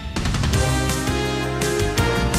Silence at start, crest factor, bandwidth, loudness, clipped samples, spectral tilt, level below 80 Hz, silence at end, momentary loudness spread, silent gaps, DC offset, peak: 0 s; 14 dB; 16 kHz; -21 LUFS; under 0.1%; -4.5 dB/octave; -28 dBFS; 0 s; 3 LU; none; under 0.1%; -6 dBFS